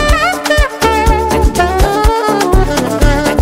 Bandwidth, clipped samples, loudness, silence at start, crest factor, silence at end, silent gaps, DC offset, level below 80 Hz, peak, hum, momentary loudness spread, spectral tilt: 16.5 kHz; under 0.1%; -12 LUFS; 0 s; 10 dB; 0 s; none; 0.2%; -14 dBFS; 0 dBFS; none; 1 LU; -5 dB/octave